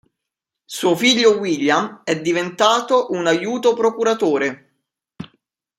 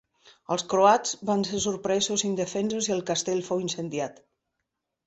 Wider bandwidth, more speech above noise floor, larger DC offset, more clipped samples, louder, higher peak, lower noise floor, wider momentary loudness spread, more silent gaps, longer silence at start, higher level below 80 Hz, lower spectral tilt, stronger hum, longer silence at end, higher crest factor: first, 16 kHz vs 8.4 kHz; first, 66 dB vs 57 dB; neither; neither; first, -17 LUFS vs -26 LUFS; first, 0 dBFS vs -6 dBFS; about the same, -83 dBFS vs -83 dBFS; first, 14 LU vs 10 LU; neither; first, 0.7 s vs 0.5 s; about the same, -66 dBFS vs -64 dBFS; about the same, -3.5 dB/octave vs -3.5 dB/octave; neither; second, 0.55 s vs 0.95 s; about the same, 18 dB vs 22 dB